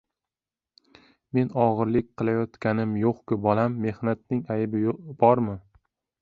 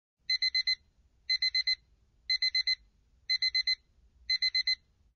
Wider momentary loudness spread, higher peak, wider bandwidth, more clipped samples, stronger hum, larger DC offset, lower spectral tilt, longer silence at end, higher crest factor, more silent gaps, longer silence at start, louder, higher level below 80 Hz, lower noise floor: about the same, 8 LU vs 8 LU; first, -4 dBFS vs -20 dBFS; second, 5 kHz vs 6.6 kHz; neither; neither; neither; first, -10.5 dB/octave vs 6.5 dB/octave; first, 0.6 s vs 0.4 s; first, 22 dB vs 12 dB; neither; first, 1.35 s vs 0.3 s; first, -25 LUFS vs -29 LUFS; first, -58 dBFS vs -66 dBFS; first, under -90 dBFS vs -67 dBFS